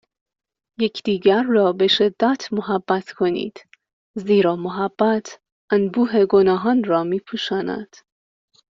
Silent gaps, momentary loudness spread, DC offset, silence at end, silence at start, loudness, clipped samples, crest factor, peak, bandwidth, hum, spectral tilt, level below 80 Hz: 3.93-4.14 s, 5.52-5.68 s; 9 LU; under 0.1%; 0.85 s; 0.8 s; -19 LUFS; under 0.1%; 16 dB; -4 dBFS; 7.6 kHz; none; -4 dB/octave; -62 dBFS